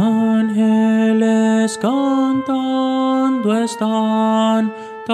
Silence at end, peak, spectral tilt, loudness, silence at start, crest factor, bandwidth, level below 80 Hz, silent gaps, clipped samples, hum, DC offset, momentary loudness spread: 0 s; -4 dBFS; -6 dB/octave; -16 LUFS; 0 s; 12 dB; 11.5 kHz; -68 dBFS; none; under 0.1%; none; under 0.1%; 4 LU